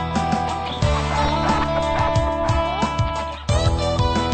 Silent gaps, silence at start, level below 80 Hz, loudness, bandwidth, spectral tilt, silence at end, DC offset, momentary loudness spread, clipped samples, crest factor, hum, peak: none; 0 s; -28 dBFS; -21 LUFS; 9 kHz; -5.5 dB/octave; 0 s; 0.3%; 3 LU; under 0.1%; 14 dB; none; -6 dBFS